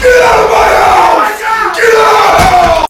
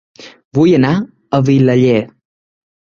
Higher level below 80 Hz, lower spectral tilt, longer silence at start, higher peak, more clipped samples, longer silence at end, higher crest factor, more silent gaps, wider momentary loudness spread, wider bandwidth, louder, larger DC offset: first, -26 dBFS vs -50 dBFS; second, -3 dB/octave vs -8 dB/octave; second, 0 s vs 0.2 s; about the same, 0 dBFS vs -2 dBFS; first, 7% vs under 0.1%; second, 0.05 s vs 0.9 s; second, 6 dB vs 12 dB; second, none vs 0.45-0.51 s; second, 5 LU vs 9 LU; first, 18.5 kHz vs 7.2 kHz; first, -6 LUFS vs -13 LUFS; neither